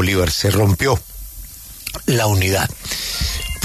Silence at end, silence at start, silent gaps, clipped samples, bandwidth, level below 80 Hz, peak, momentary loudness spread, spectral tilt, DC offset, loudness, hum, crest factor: 0 s; 0 s; none; under 0.1%; 14 kHz; -32 dBFS; -4 dBFS; 18 LU; -4.5 dB/octave; under 0.1%; -18 LUFS; none; 16 dB